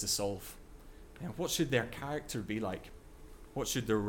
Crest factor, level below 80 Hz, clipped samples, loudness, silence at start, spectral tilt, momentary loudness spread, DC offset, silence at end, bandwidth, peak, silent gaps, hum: 20 dB; -54 dBFS; under 0.1%; -36 LUFS; 0 s; -4 dB/octave; 24 LU; under 0.1%; 0 s; 18 kHz; -18 dBFS; none; none